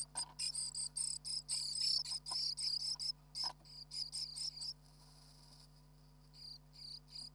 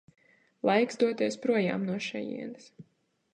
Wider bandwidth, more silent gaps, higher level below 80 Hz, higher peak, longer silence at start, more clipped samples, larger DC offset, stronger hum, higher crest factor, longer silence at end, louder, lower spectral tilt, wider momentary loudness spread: first, over 20 kHz vs 10 kHz; neither; first, -68 dBFS vs -78 dBFS; second, -24 dBFS vs -12 dBFS; second, 0 s vs 0.65 s; neither; neither; neither; about the same, 20 dB vs 20 dB; second, 0 s vs 0.5 s; second, -39 LUFS vs -29 LUFS; second, 0.5 dB/octave vs -5.5 dB/octave; first, 17 LU vs 13 LU